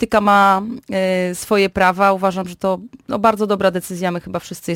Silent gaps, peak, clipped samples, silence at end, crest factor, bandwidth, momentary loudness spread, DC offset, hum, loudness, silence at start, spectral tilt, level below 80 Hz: none; -2 dBFS; under 0.1%; 0 s; 16 dB; 17 kHz; 12 LU; under 0.1%; none; -17 LUFS; 0 s; -5 dB/octave; -48 dBFS